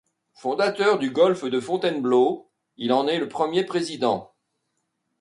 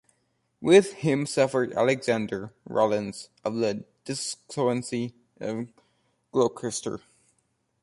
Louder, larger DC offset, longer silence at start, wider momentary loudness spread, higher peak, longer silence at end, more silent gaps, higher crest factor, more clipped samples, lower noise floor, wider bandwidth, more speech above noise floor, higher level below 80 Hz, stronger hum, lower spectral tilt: first, -23 LUFS vs -26 LUFS; neither; second, 0.45 s vs 0.6 s; second, 9 LU vs 16 LU; about the same, -8 dBFS vs -6 dBFS; about the same, 0.95 s vs 0.85 s; neither; second, 16 dB vs 22 dB; neither; about the same, -76 dBFS vs -73 dBFS; about the same, 11.5 kHz vs 11.5 kHz; first, 54 dB vs 47 dB; second, -72 dBFS vs -66 dBFS; neither; about the same, -5 dB/octave vs -5 dB/octave